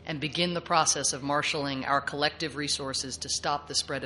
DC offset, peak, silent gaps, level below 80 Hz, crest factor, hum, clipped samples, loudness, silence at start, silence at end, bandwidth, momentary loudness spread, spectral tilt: under 0.1%; -8 dBFS; none; -58 dBFS; 20 dB; none; under 0.1%; -28 LUFS; 0 s; 0 s; 11.5 kHz; 6 LU; -2 dB/octave